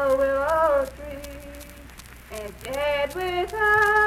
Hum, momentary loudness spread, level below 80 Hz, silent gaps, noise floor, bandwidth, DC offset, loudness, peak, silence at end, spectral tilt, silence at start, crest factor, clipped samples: none; 22 LU; -44 dBFS; none; -44 dBFS; 16.5 kHz; under 0.1%; -23 LUFS; -8 dBFS; 0 s; -4 dB/octave; 0 s; 16 dB; under 0.1%